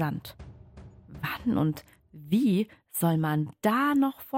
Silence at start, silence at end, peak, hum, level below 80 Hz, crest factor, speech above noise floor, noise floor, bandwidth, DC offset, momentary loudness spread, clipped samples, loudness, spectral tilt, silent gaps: 0 s; 0 s; -12 dBFS; none; -58 dBFS; 16 dB; 22 dB; -49 dBFS; 16.5 kHz; under 0.1%; 19 LU; under 0.1%; -27 LUFS; -6.5 dB/octave; none